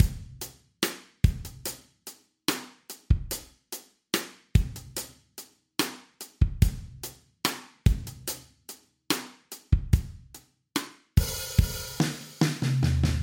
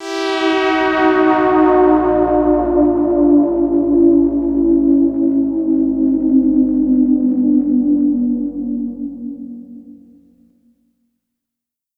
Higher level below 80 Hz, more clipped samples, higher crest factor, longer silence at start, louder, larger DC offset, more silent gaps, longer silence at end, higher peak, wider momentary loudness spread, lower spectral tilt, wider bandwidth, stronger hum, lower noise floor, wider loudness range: first, -34 dBFS vs -40 dBFS; neither; first, 24 dB vs 12 dB; about the same, 0 s vs 0 s; second, -29 LUFS vs -14 LUFS; neither; neither; second, 0 s vs 2.05 s; second, -6 dBFS vs -2 dBFS; first, 19 LU vs 10 LU; second, -4.5 dB/octave vs -6.5 dB/octave; first, 17 kHz vs 7.6 kHz; second, none vs 60 Hz at -60 dBFS; second, -53 dBFS vs -83 dBFS; second, 4 LU vs 10 LU